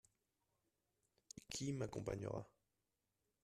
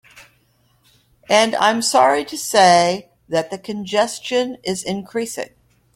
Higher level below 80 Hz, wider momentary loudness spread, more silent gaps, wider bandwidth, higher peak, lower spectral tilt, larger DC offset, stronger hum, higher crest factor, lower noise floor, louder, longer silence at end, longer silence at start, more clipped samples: second, -72 dBFS vs -60 dBFS; about the same, 15 LU vs 15 LU; neither; second, 13.5 kHz vs 16.5 kHz; second, -30 dBFS vs 0 dBFS; first, -5 dB/octave vs -3 dB/octave; neither; neither; about the same, 22 dB vs 18 dB; first, -89 dBFS vs -60 dBFS; second, -47 LUFS vs -18 LUFS; first, 0.95 s vs 0.5 s; first, 1.35 s vs 0.15 s; neither